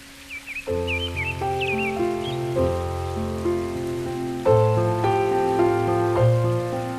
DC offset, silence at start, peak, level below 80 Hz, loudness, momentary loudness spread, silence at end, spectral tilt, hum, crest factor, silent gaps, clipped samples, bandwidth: under 0.1%; 0 s; -6 dBFS; -44 dBFS; -23 LUFS; 8 LU; 0 s; -7 dB/octave; none; 16 dB; none; under 0.1%; 14 kHz